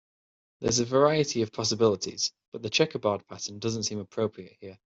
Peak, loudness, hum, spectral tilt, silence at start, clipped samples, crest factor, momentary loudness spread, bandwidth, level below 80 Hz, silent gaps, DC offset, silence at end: -8 dBFS; -27 LUFS; none; -4 dB/octave; 0.6 s; under 0.1%; 20 dB; 13 LU; 8.2 kHz; -62 dBFS; 2.48-2.52 s; under 0.1%; 0.2 s